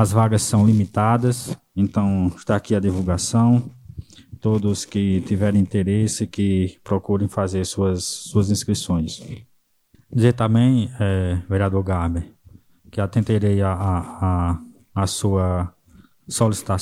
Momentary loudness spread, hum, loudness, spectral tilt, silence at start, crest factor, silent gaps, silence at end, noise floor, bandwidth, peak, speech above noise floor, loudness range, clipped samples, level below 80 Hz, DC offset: 11 LU; none; -21 LUFS; -6.5 dB/octave; 0 s; 18 dB; none; 0 s; -59 dBFS; 13.5 kHz; -2 dBFS; 39 dB; 3 LU; under 0.1%; -42 dBFS; under 0.1%